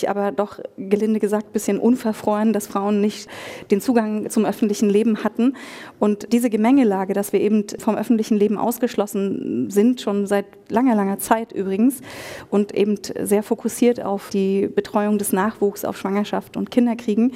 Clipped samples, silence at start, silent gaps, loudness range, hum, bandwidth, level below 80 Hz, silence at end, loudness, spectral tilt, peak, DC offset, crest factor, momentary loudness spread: under 0.1%; 0 s; none; 2 LU; none; 16 kHz; -62 dBFS; 0 s; -20 LUFS; -6 dB/octave; -2 dBFS; under 0.1%; 18 dB; 7 LU